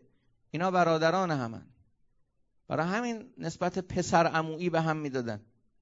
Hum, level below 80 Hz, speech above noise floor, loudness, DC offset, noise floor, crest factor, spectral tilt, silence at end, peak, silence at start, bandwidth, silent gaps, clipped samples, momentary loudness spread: none; -62 dBFS; 43 dB; -30 LUFS; under 0.1%; -73 dBFS; 20 dB; -5.5 dB/octave; 0.4 s; -10 dBFS; 0.55 s; 8 kHz; none; under 0.1%; 14 LU